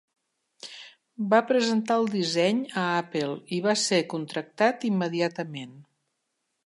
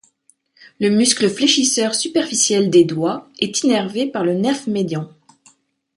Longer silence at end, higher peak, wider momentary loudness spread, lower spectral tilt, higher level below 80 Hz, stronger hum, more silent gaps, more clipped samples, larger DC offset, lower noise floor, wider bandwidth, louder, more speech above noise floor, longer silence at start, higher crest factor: about the same, 0.85 s vs 0.9 s; second, -10 dBFS vs -2 dBFS; first, 18 LU vs 9 LU; about the same, -4.5 dB/octave vs -3.5 dB/octave; second, -78 dBFS vs -64 dBFS; neither; neither; neither; neither; first, -79 dBFS vs -59 dBFS; about the same, 11.5 kHz vs 11.5 kHz; second, -26 LUFS vs -17 LUFS; first, 53 dB vs 42 dB; second, 0.65 s vs 0.8 s; about the same, 18 dB vs 16 dB